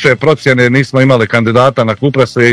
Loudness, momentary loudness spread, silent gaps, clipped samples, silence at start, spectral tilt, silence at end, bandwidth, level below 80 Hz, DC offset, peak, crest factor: -9 LUFS; 3 LU; none; 3%; 0 s; -6.5 dB/octave; 0 s; 11 kHz; -46 dBFS; under 0.1%; 0 dBFS; 10 dB